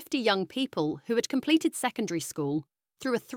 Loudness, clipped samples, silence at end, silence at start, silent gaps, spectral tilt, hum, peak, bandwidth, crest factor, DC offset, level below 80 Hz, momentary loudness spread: -29 LUFS; under 0.1%; 0 s; 0 s; none; -4 dB/octave; none; -12 dBFS; 17 kHz; 18 dB; under 0.1%; -72 dBFS; 7 LU